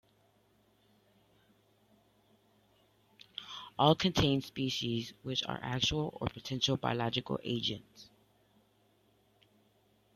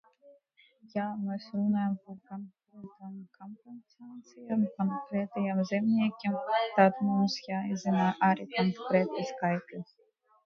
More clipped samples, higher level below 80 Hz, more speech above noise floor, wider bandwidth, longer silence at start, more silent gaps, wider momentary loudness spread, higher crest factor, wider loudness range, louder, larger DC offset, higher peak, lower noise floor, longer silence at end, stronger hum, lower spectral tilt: neither; first, -60 dBFS vs -76 dBFS; about the same, 37 dB vs 34 dB; first, 14.5 kHz vs 7 kHz; first, 3.4 s vs 0.25 s; neither; second, 16 LU vs 23 LU; about the same, 26 dB vs 22 dB; second, 6 LU vs 9 LU; second, -33 LUFS vs -30 LUFS; neither; about the same, -12 dBFS vs -10 dBFS; first, -70 dBFS vs -65 dBFS; first, 2.1 s vs 0.6 s; neither; second, -5 dB/octave vs -7 dB/octave